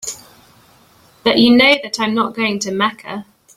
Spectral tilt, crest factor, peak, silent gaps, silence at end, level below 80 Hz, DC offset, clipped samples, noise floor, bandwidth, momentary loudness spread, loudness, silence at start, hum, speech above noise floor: -3.5 dB/octave; 16 dB; 0 dBFS; none; 0.35 s; -54 dBFS; under 0.1%; under 0.1%; -50 dBFS; 15.5 kHz; 20 LU; -14 LUFS; 0.05 s; none; 35 dB